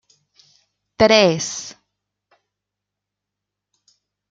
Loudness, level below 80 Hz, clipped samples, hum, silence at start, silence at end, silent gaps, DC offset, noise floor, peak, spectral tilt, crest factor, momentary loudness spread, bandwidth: -16 LUFS; -56 dBFS; under 0.1%; 50 Hz at -55 dBFS; 1 s; 2.6 s; none; under 0.1%; -83 dBFS; 0 dBFS; -3.5 dB/octave; 22 dB; 18 LU; 9.2 kHz